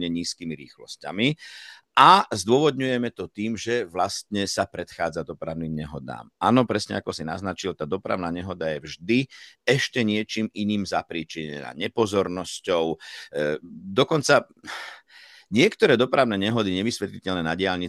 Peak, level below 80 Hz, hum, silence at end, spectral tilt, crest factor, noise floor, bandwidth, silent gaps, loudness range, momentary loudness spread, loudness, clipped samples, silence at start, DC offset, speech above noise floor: -2 dBFS; -60 dBFS; none; 0 s; -4.5 dB/octave; 22 dB; -51 dBFS; 12.5 kHz; none; 6 LU; 15 LU; -24 LUFS; under 0.1%; 0 s; under 0.1%; 26 dB